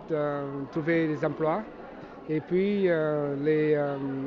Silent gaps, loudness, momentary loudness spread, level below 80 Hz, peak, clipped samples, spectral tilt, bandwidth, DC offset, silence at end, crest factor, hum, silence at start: none; -28 LUFS; 10 LU; -62 dBFS; -14 dBFS; under 0.1%; -9 dB/octave; 6.4 kHz; under 0.1%; 0 s; 14 dB; none; 0 s